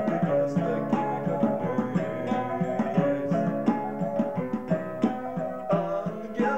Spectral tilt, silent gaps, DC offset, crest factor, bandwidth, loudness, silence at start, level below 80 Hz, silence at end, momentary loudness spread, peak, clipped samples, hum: -9 dB/octave; none; 0.4%; 16 dB; 8.2 kHz; -28 LUFS; 0 s; -62 dBFS; 0 s; 5 LU; -12 dBFS; under 0.1%; none